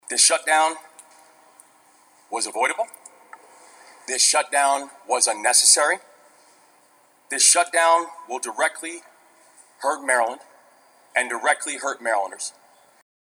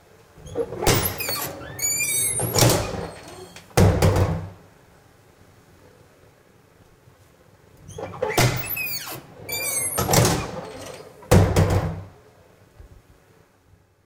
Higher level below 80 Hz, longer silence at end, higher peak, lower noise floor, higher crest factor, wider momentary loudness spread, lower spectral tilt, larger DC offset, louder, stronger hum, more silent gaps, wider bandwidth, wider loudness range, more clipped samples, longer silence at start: second, under -90 dBFS vs -38 dBFS; second, 0.8 s vs 1.2 s; about the same, -2 dBFS vs -2 dBFS; about the same, -58 dBFS vs -57 dBFS; about the same, 22 dB vs 22 dB; about the same, 17 LU vs 19 LU; second, 2.5 dB/octave vs -4 dB/octave; neither; about the same, -20 LUFS vs -22 LUFS; neither; neither; first, over 20 kHz vs 18 kHz; about the same, 8 LU vs 7 LU; neither; second, 0.1 s vs 0.4 s